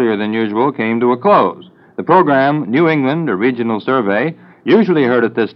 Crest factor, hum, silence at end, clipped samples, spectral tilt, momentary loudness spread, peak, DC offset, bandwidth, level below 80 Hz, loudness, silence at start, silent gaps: 14 dB; none; 0.05 s; under 0.1%; -9.5 dB/octave; 7 LU; 0 dBFS; under 0.1%; 5.8 kHz; -70 dBFS; -14 LUFS; 0 s; none